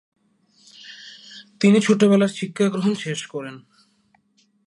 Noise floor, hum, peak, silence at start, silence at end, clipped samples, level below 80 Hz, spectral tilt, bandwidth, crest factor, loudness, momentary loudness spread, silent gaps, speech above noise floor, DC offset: -63 dBFS; none; -4 dBFS; 0.85 s; 1.1 s; under 0.1%; -72 dBFS; -6 dB/octave; 11 kHz; 18 dB; -19 LUFS; 24 LU; none; 44 dB; under 0.1%